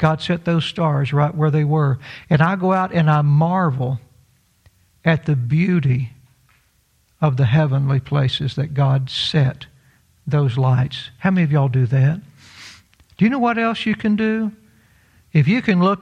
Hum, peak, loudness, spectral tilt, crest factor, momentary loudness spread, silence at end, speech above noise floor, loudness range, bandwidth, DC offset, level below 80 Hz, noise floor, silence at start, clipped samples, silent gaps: none; -2 dBFS; -18 LUFS; -8 dB/octave; 16 dB; 7 LU; 0 s; 43 dB; 3 LU; 8.8 kHz; under 0.1%; -52 dBFS; -61 dBFS; 0 s; under 0.1%; none